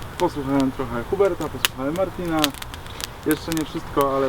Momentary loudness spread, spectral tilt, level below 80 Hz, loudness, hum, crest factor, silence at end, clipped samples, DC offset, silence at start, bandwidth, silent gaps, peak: 8 LU; -4.5 dB/octave; -42 dBFS; -24 LUFS; none; 24 dB; 0 s; under 0.1%; under 0.1%; 0 s; 19.5 kHz; none; 0 dBFS